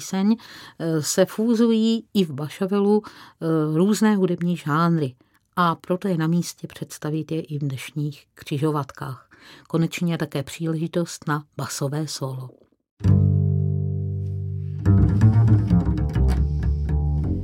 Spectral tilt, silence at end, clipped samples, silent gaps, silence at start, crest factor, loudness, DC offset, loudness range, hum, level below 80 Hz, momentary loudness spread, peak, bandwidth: -6.5 dB/octave; 0 s; under 0.1%; 12.91-12.97 s; 0 s; 16 dB; -23 LUFS; under 0.1%; 7 LU; none; -32 dBFS; 12 LU; -6 dBFS; 16.5 kHz